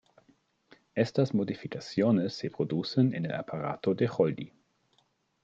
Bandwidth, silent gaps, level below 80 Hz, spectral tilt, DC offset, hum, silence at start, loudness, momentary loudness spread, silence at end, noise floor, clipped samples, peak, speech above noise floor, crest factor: 7.8 kHz; none; -72 dBFS; -7.5 dB/octave; under 0.1%; none; 0.95 s; -30 LUFS; 9 LU; 0.95 s; -71 dBFS; under 0.1%; -12 dBFS; 42 dB; 18 dB